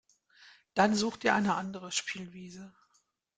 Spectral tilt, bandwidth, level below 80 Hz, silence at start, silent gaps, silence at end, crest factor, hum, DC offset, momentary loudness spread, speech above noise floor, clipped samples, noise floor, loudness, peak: -4 dB/octave; 9.4 kHz; -70 dBFS; 0.75 s; none; 0.7 s; 24 dB; none; under 0.1%; 19 LU; 43 dB; under 0.1%; -74 dBFS; -30 LUFS; -10 dBFS